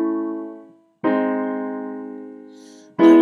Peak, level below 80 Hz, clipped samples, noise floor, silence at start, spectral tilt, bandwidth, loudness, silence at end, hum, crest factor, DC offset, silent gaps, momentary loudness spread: -4 dBFS; -82 dBFS; under 0.1%; -45 dBFS; 0 s; -7 dB/octave; 6.6 kHz; -22 LUFS; 0 s; none; 16 dB; under 0.1%; none; 23 LU